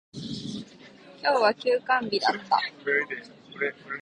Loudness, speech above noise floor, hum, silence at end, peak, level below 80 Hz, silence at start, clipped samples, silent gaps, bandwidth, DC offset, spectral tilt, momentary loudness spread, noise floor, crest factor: -26 LUFS; 24 dB; none; 0 s; -8 dBFS; -70 dBFS; 0.15 s; under 0.1%; none; 10 kHz; under 0.1%; -4 dB/octave; 15 LU; -50 dBFS; 20 dB